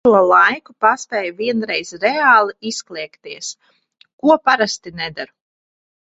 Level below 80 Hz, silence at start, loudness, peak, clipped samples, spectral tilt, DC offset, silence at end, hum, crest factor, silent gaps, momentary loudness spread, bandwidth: -62 dBFS; 0.05 s; -16 LUFS; 0 dBFS; under 0.1%; -3 dB/octave; under 0.1%; 0.85 s; none; 18 dB; 4.13-4.18 s; 18 LU; 8.2 kHz